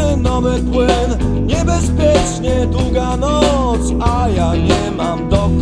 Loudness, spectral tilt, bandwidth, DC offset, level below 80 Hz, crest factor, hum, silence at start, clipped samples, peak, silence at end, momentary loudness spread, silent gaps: -15 LUFS; -6 dB/octave; 10.5 kHz; under 0.1%; -20 dBFS; 12 dB; none; 0 s; under 0.1%; 0 dBFS; 0 s; 3 LU; none